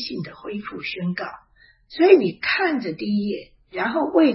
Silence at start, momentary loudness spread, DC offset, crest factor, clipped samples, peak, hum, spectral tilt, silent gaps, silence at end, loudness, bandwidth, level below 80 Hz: 0 s; 17 LU; under 0.1%; 20 dB; under 0.1%; 0 dBFS; none; -9.5 dB/octave; none; 0 s; -22 LUFS; 5.8 kHz; -60 dBFS